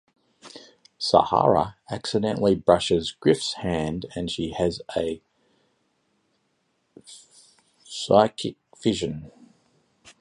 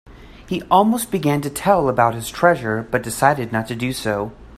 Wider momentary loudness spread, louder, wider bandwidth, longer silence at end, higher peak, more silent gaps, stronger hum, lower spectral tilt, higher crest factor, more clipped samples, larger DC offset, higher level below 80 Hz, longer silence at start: first, 21 LU vs 8 LU; second, -24 LUFS vs -19 LUFS; second, 11.5 kHz vs 16 kHz; first, 0.9 s vs 0 s; about the same, -2 dBFS vs 0 dBFS; neither; neither; about the same, -5.5 dB/octave vs -5 dB/octave; first, 24 dB vs 18 dB; neither; neither; second, -52 dBFS vs -46 dBFS; first, 0.45 s vs 0.1 s